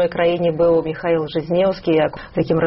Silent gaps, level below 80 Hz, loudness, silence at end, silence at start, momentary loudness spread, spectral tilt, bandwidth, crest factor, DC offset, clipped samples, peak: none; -46 dBFS; -18 LUFS; 0 s; 0 s; 4 LU; -5.5 dB/octave; 5.8 kHz; 12 dB; under 0.1%; under 0.1%; -6 dBFS